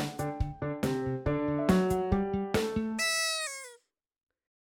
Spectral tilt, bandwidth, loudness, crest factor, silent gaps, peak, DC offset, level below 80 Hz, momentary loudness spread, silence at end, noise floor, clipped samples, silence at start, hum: -4.5 dB/octave; 17.5 kHz; -30 LUFS; 20 dB; none; -12 dBFS; under 0.1%; -46 dBFS; 8 LU; 1 s; -65 dBFS; under 0.1%; 0 s; none